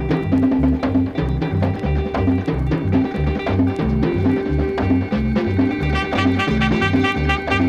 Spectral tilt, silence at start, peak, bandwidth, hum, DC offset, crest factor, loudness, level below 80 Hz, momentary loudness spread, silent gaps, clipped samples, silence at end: -8 dB/octave; 0 s; -4 dBFS; 8.6 kHz; none; under 0.1%; 14 dB; -19 LUFS; -28 dBFS; 4 LU; none; under 0.1%; 0 s